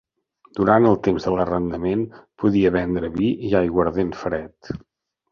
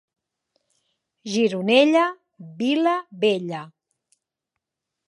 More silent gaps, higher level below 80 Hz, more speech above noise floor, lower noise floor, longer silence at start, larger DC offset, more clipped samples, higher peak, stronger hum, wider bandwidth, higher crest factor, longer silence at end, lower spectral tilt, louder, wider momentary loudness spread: neither; first, -44 dBFS vs -80 dBFS; second, 38 dB vs 63 dB; second, -58 dBFS vs -84 dBFS; second, 0.55 s vs 1.25 s; neither; neither; about the same, -2 dBFS vs -2 dBFS; neither; second, 7 kHz vs 11.5 kHz; about the same, 20 dB vs 22 dB; second, 0.55 s vs 1.4 s; first, -8.5 dB/octave vs -5 dB/octave; about the same, -21 LUFS vs -21 LUFS; about the same, 16 LU vs 17 LU